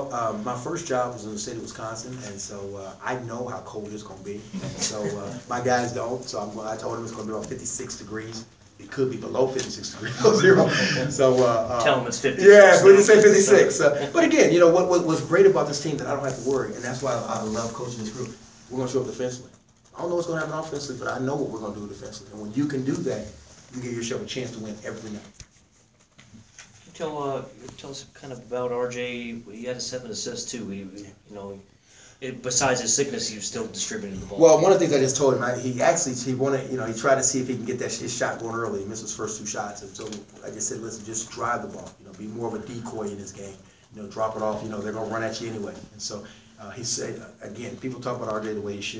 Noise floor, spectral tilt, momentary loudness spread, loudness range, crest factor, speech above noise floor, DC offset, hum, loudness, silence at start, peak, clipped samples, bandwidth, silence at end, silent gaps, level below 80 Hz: -59 dBFS; -4 dB/octave; 20 LU; 18 LU; 24 dB; 36 dB; under 0.1%; none; -23 LUFS; 0 s; 0 dBFS; under 0.1%; 8 kHz; 0 s; none; -58 dBFS